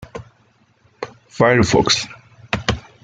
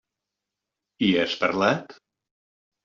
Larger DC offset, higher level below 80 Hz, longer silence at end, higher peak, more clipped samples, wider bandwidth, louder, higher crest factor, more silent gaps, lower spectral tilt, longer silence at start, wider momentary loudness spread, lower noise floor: neither; first, -42 dBFS vs -64 dBFS; second, 0.25 s vs 0.95 s; first, 0 dBFS vs -6 dBFS; neither; first, 9.6 kHz vs 7.4 kHz; first, -17 LUFS vs -23 LUFS; about the same, 20 dB vs 22 dB; neither; about the same, -4 dB/octave vs -3 dB/octave; second, 0 s vs 1 s; first, 19 LU vs 4 LU; second, -57 dBFS vs -86 dBFS